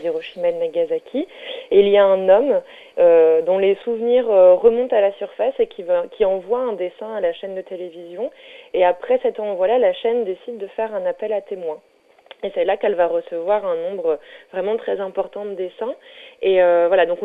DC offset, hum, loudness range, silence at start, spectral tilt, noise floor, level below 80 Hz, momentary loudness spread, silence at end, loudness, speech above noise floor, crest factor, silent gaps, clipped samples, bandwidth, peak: under 0.1%; none; 8 LU; 0 s; -7 dB/octave; -47 dBFS; -60 dBFS; 16 LU; 0 s; -19 LUFS; 29 dB; 16 dB; none; under 0.1%; 4 kHz; -2 dBFS